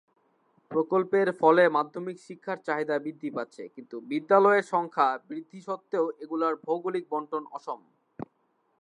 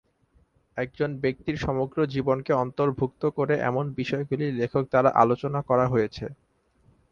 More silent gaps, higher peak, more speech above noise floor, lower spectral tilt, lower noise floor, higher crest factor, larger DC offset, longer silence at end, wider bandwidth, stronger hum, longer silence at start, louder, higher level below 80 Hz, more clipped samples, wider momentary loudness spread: neither; about the same, -6 dBFS vs -4 dBFS; first, 45 dB vs 39 dB; second, -6.5 dB/octave vs -8 dB/octave; first, -72 dBFS vs -64 dBFS; about the same, 22 dB vs 22 dB; neither; second, 0.55 s vs 0.8 s; first, 10.5 kHz vs 7.2 kHz; neither; about the same, 0.7 s vs 0.75 s; about the same, -27 LUFS vs -25 LUFS; second, -82 dBFS vs -52 dBFS; neither; first, 19 LU vs 8 LU